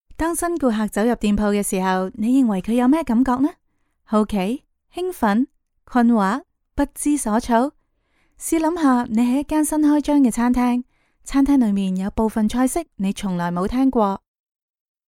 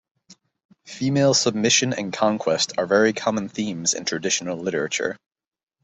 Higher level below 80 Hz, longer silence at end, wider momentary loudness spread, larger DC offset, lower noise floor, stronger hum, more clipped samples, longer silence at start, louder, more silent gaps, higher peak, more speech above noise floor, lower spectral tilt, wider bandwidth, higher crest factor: first, -40 dBFS vs -64 dBFS; first, 0.9 s vs 0.7 s; about the same, 8 LU vs 9 LU; neither; first, -64 dBFS vs -55 dBFS; neither; neither; second, 0.1 s vs 0.3 s; about the same, -20 LUFS vs -21 LUFS; second, none vs 0.65-0.69 s; about the same, -4 dBFS vs -4 dBFS; first, 46 dB vs 33 dB; first, -5.5 dB/octave vs -3 dB/octave; first, 16.5 kHz vs 8.4 kHz; about the same, 16 dB vs 20 dB